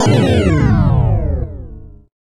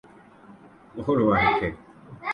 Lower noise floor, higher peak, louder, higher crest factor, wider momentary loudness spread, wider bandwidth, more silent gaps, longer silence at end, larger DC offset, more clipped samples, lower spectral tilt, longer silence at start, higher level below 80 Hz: second, -33 dBFS vs -50 dBFS; first, 0 dBFS vs -8 dBFS; first, -14 LUFS vs -23 LUFS; about the same, 14 dB vs 18 dB; second, 17 LU vs 21 LU; about the same, 11 kHz vs 10.5 kHz; neither; first, 0.45 s vs 0 s; neither; neither; about the same, -7 dB/octave vs -8 dB/octave; second, 0 s vs 0.5 s; first, -22 dBFS vs -48 dBFS